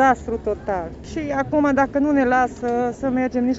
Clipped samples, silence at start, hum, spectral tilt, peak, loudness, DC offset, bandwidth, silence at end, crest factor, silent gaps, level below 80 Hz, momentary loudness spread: under 0.1%; 0 s; none; -6.5 dB/octave; -4 dBFS; -21 LUFS; under 0.1%; 8 kHz; 0 s; 16 dB; none; -42 dBFS; 9 LU